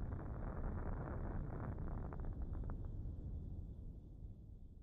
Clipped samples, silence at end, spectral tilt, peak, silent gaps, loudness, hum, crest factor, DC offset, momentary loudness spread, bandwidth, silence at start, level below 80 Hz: under 0.1%; 0 s; -10.5 dB/octave; -32 dBFS; none; -49 LUFS; none; 14 dB; under 0.1%; 10 LU; 2.6 kHz; 0 s; -48 dBFS